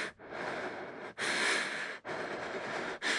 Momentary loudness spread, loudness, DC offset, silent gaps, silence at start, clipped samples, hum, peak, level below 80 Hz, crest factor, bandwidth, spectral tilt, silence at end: 11 LU; -36 LUFS; under 0.1%; none; 0 s; under 0.1%; none; -18 dBFS; -76 dBFS; 18 dB; 11.5 kHz; -1.5 dB/octave; 0 s